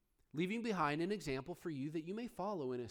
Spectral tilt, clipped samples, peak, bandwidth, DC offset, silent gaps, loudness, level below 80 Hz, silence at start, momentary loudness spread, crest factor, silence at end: -6 dB/octave; under 0.1%; -24 dBFS; 19.5 kHz; under 0.1%; none; -41 LUFS; -68 dBFS; 0.35 s; 8 LU; 18 dB; 0 s